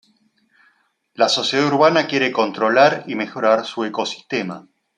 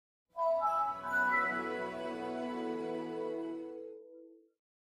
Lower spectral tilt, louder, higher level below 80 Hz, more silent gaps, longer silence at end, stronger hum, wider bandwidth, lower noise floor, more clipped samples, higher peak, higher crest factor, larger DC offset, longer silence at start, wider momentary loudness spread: second, -4 dB/octave vs -5.5 dB/octave; first, -18 LUFS vs -35 LUFS; first, -70 dBFS vs -76 dBFS; neither; second, 0.35 s vs 0.5 s; neither; second, 10 kHz vs 14.5 kHz; first, -62 dBFS vs -57 dBFS; neither; first, -2 dBFS vs -20 dBFS; about the same, 18 dB vs 16 dB; neither; first, 1.2 s vs 0.35 s; second, 10 LU vs 17 LU